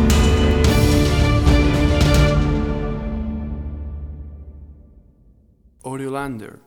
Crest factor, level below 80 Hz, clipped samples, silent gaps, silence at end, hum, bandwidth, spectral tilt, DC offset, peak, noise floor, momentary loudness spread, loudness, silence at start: 16 dB; -22 dBFS; under 0.1%; none; 0.15 s; none; 18.5 kHz; -6 dB/octave; under 0.1%; -2 dBFS; -53 dBFS; 18 LU; -18 LUFS; 0 s